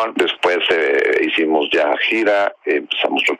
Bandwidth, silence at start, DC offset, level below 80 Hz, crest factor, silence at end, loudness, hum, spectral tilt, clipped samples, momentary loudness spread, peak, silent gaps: 13.5 kHz; 0 s; under 0.1%; -64 dBFS; 12 dB; 0.05 s; -16 LUFS; none; -3 dB/octave; under 0.1%; 3 LU; -4 dBFS; none